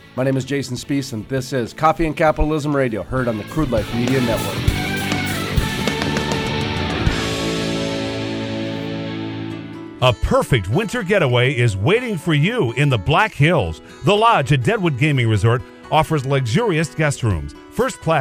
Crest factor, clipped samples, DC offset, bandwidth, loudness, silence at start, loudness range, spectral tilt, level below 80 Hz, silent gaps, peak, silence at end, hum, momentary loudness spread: 18 dB; under 0.1%; under 0.1%; over 20 kHz; -19 LUFS; 0.05 s; 5 LU; -5.5 dB/octave; -34 dBFS; none; -2 dBFS; 0 s; none; 8 LU